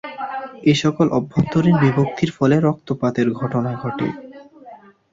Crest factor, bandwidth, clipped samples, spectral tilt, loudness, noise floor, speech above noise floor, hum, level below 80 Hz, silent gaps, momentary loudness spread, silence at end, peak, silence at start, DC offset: 16 dB; 7.8 kHz; under 0.1%; -7 dB/octave; -19 LUFS; -43 dBFS; 25 dB; none; -52 dBFS; none; 10 LU; 0.35 s; -4 dBFS; 0.05 s; under 0.1%